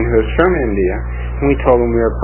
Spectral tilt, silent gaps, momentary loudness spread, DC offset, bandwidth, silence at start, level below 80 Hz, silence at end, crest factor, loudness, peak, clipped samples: -11.5 dB/octave; none; 7 LU; under 0.1%; 3.2 kHz; 0 s; -22 dBFS; 0 s; 14 dB; -15 LUFS; 0 dBFS; under 0.1%